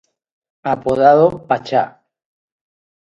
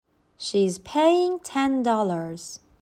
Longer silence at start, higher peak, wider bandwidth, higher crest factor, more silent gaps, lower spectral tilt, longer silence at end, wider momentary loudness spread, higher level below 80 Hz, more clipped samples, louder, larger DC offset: first, 0.65 s vs 0.4 s; first, 0 dBFS vs -8 dBFS; second, 8.4 kHz vs 15.5 kHz; about the same, 18 dB vs 16 dB; neither; first, -7.5 dB/octave vs -5 dB/octave; first, 1.25 s vs 0.25 s; about the same, 14 LU vs 15 LU; first, -54 dBFS vs -64 dBFS; neither; first, -15 LUFS vs -23 LUFS; neither